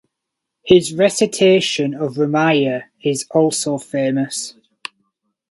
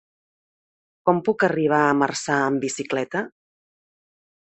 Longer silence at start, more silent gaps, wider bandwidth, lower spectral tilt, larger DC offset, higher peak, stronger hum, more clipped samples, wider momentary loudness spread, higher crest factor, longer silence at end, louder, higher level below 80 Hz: second, 0.65 s vs 1.05 s; neither; first, 11.5 kHz vs 8.6 kHz; about the same, -4.5 dB/octave vs -5 dB/octave; neither; about the same, 0 dBFS vs -2 dBFS; neither; neither; first, 19 LU vs 8 LU; about the same, 18 dB vs 22 dB; second, 1 s vs 1.25 s; first, -17 LUFS vs -22 LUFS; first, -58 dBFS vs -68 dBFS